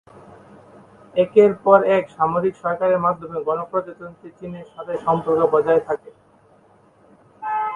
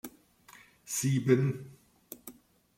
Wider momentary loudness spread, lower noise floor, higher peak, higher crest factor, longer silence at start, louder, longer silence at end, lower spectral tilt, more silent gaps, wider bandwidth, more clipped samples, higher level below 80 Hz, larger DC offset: second, 20 LU vs 25 LU; second, -54 dBFS vs -58 dBFS; first, -2 dBFS vs -10 dBFS; about the same, 20 dB vs 24 dB; first, 1.15 s vs 0.05 s; first, -19 LUFS vs -30 LUFS; second, 0 s vs 0.45 s; first, -8 dB/octave vs -6 dB/octave; neither; second, 9.4 kHz vs 16.5 kHz; neither; first, -60 dBFS vs -70 dBFS; neither